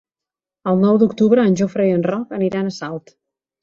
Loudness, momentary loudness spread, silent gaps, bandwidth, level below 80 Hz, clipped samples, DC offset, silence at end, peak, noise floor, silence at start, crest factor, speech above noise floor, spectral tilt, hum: -17 LUFS; 14 LU; none; 7.4 kHz; -60 dBFS; under 0.1%; under 0.1%; 0.65 s; -2 dBFS; -88 dBFS; 0.65 s; 16 dB; 72 dB; -7.5 dB/octave; none